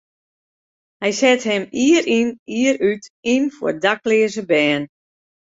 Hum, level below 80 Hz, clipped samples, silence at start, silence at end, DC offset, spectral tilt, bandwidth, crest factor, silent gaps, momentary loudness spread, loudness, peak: none; -62 dBFS; under 0.1%; 1 s; 0.7 s; under 0.1%; -4 dB/octave; 8 kHz; 18 dB; 2.39-2.46 s, 3.10-3.23 s; 7 LU; -18 LUFS; -2 dBFS